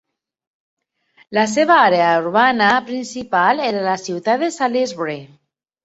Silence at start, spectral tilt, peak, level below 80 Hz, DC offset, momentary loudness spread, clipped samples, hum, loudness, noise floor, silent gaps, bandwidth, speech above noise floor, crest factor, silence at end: 1.3 s; -4 dB/octave; -2 dBFS; -64 dBFS; under 0.1%; 13 LU; under 0.1%; none; -17 LUFS; -55 dBFS; none; 8.2 kHz; 39 dB; 18 dB; 0.6 s